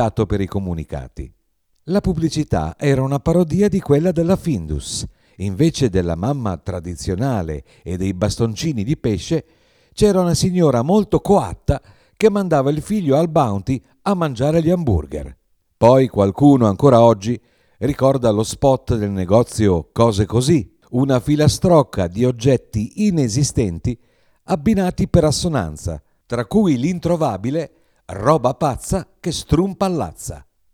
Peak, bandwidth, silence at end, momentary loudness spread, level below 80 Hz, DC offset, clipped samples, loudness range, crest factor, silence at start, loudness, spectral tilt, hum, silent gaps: 0 dBFS; 16 kHz; 0.3 s; 12 LU; -36 dBFS; under 0.1%; under 0.1%; 6 LU; 16 dB; 0 s; -18 LUFS; -6.5 dB/octave; none; none